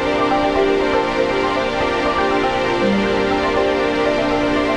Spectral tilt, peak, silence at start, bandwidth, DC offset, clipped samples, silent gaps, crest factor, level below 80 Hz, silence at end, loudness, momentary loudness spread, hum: -5.5 dB/octave; -4 dBFS; 0 s; 11 kHz; under 0.1%; under 0.1%; none; 14 dB; -36 dBFS; 0 s; -17 LUFS; 2 LU; none